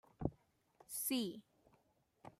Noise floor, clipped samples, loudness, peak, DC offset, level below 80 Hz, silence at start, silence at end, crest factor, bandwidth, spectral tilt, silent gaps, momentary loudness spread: -77 dBFS; under 0.1%; -42 LUFS; -24 dBFS; under 0.1%; -64 dBFS; 0.2 s; 0.1 s; 24 dB; 16 kHz; -4 dB/octave; none; 18 LU